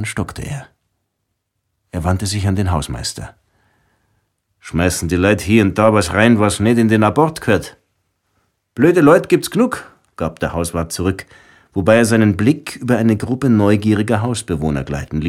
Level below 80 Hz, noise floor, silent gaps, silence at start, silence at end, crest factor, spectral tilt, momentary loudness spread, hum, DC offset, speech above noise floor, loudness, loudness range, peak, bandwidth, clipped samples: -38 dBFS; -73 dBFS; none; 0 s; 0 s; 16 dB; -6 dB/octave; 13 LU; none; under 0.1%; 58 dB; -16 LUFS; 8 LU; 0 dBFS; 15.5 kHz; under 0.1%